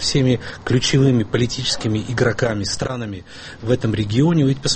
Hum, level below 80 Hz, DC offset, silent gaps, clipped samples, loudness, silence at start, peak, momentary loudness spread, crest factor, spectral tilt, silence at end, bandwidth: none; -40 dBFS; under 0.1%; none; under 0.1%; -19 LUFS; 0 s; -4 dBFS; 11 LU; 16 dB; -5 dB/octave; 0 s; 8.8 kHz